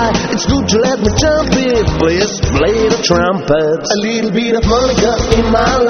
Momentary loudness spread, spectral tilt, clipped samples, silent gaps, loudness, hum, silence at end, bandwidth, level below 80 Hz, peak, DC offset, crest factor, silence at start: 3 LU; -4.5 dB/octave; under 0.1%; none; -12 LUFS; none; 0 s; 8.4 kHz; -24 dBFS; 0 dBFS; under 0.1%; 12 dB; 0 s